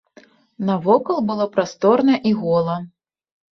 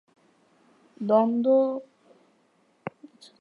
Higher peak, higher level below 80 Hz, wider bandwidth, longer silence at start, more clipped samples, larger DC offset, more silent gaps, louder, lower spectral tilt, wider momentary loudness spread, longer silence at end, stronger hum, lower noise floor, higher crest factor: first, -2 dBFS vs -8 dBFS; first, -62 dBFS vs -82 dBFS; about the same, 6.8 kHz vs 6.8 kHz; second, 0.6 s vs 1 s; neither; neither; neither; first, -19 LUFS vs -24 LUFS; second, -7 dB/octave vs -8.5 dB/octave; second, 10 LU vs 20 LU; first, 0.65 s vs 0.5 s; neither; second, -51 dBFS vs -66 dBFS; about the same, 18 dB vs 20 dB